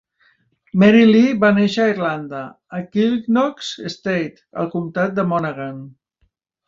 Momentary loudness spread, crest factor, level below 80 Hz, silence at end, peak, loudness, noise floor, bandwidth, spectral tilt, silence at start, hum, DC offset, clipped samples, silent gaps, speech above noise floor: 18 LU; 18 dB; -60 dBFS; 0.8 s; -2 dBFS; -17 LUFS; -66 dBFS; 7.6 kHz; -6.5 dB/octave; 0.75 s; none; under 0.1%; under 0.1%; none; 49 dB